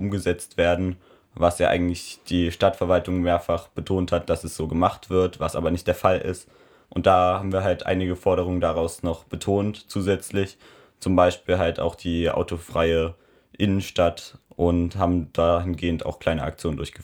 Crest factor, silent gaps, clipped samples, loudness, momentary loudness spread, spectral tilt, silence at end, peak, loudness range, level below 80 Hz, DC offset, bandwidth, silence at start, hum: 20 dB; none; under 0.1%; -24 LUFS; 8 LU; -6 dB/octave; 0 s; -4 dBFS; 2 LU; -42 dBFS; under 0.1%; 17.5 kHz; 0 s; none